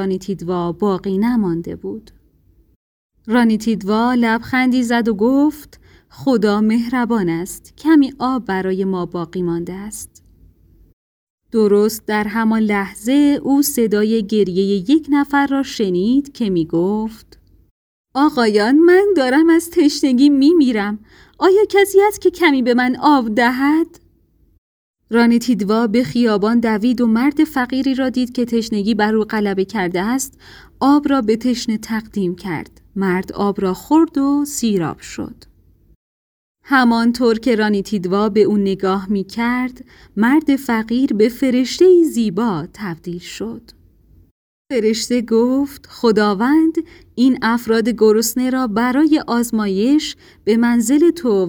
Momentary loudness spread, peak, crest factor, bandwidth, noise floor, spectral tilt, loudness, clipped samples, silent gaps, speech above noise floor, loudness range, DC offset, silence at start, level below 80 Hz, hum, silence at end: 11 LU; -2 dBFS; 16 dB; over 20 kHz; -55 dBFS; -5.5 dB/octave; -16 LUFS; under 0.1%; 2.76-3.10 s, 10.93-11.38 s, 17.71-18.04 s, 24.58-24.94 s, 35.96-36.55 s, 44.31-44.65 s; 40 dB; 6 LU; under 0.1%; 0 s; -50 dBFS; none; 0 s